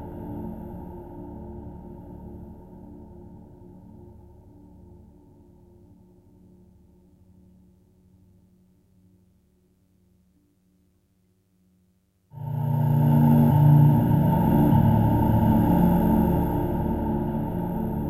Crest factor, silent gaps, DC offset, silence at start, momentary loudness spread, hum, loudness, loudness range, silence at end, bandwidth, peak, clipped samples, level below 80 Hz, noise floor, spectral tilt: 18 dB; none; under 0.1%; 0 s; 25 LU; none; -21 LUFS; 24 LU; 0 s; 14 kHz; -6 dBFS; under 0.1%; -40 dBFS; -66 dBFS; -10.5 dB/octave